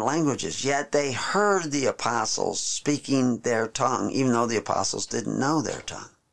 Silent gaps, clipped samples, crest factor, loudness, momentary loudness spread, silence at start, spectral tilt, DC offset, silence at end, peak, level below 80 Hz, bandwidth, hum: none; under 0.1%; 16 dB; -25 LUFS; 4 LU; 0 s; -4 dB/octave; 0.4%; 0 s; -10 dBFS; -60 dBFS; 11 kHz; none